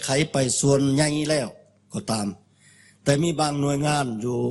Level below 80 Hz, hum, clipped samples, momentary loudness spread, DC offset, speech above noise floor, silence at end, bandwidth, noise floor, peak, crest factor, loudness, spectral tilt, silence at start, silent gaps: -54 dBFS; none; under 0.1%; 11 LU; under 0.1%; 32 dB; 0 s; 12 kHz; -55 dBFS; -6 dBFS; 18 dB; -23 LUFS; -4.5 dB/octave; 0 s; none